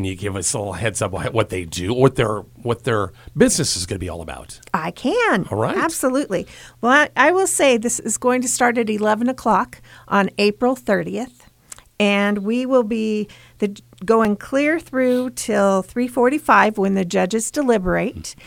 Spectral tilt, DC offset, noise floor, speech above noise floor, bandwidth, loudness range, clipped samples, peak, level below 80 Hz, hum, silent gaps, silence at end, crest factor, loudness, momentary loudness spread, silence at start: -4 dB/octave; under 0.1%; -44 dBFS; 25 dB; 17 kHz; 4 LU; under 0.1%; 0 dBFS; -46 dBFS; none; none; 0.15 s; 20 dB; -19 LUFS; 11 LU; 0 s